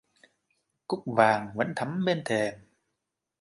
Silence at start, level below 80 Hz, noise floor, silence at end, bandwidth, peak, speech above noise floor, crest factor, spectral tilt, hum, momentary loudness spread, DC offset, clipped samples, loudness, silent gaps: 0.9 s; -70 dBFS; -84 dBFS; 0.85 s; 11.5 kHz; -6 dBFS; 57 dB; 22 dB; -6 dB/octave; none; 12 LU; under 0.1%; under 0.1%; -28 LUFS; none